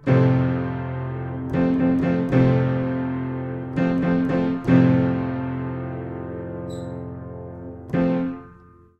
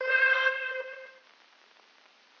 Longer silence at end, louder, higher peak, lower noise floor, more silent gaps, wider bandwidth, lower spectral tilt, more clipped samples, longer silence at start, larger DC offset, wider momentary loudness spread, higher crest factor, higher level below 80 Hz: second, 0.45 s vs 1.3 s; first, -22 LUFS vs -26 LUFS; first, -4 dBFS vs -14 dBFS; second, -49 dBFS vs -61 dBFS; neither; second, 5.8 kHz vs 6.6 kHz; first, -10 dB/octave vs 2 dB/octave; neither; about the same, 0 s vs 0 s; neither; second, 15 LU vs 20 LU; about the same, 18 dB vs 18 dB; first, -46 dBFS vs under -90 dBFS